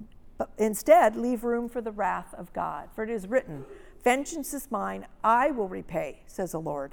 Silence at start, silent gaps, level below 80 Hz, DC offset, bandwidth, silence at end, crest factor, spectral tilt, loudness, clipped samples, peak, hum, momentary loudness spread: 0 s; none; -52 dBFS; under 0.1%; over 20 kHz; 0 s; 20 dB; -5 dB/octave; -28 LUFS; under 0.1%; -6 dBFS; none; 16 LU